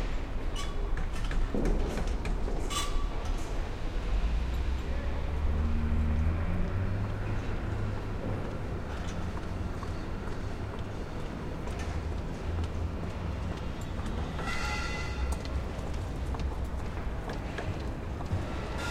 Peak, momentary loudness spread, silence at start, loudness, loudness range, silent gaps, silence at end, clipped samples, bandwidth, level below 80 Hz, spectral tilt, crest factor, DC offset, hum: -18 dBFS; 6 LU; 0 s; -35 LUFS; 4 LU; none; 0 s; under 0.1%; 14.5 kHz; -34 dBFS; -6 dB/octave; 14 dB; under 0.1%; none